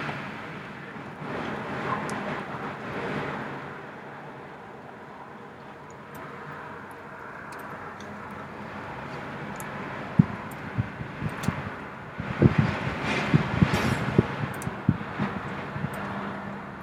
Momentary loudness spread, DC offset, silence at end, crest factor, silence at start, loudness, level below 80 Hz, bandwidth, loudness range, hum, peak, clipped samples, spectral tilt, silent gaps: 17 LU; under 0.1%; 0 s; 28 dB; 0 s; -30 LUFS; -50 dBFS; 15.5 kHz; 15 LU; none; -2 dBFS; under 0.1%; -7 dB/octave; none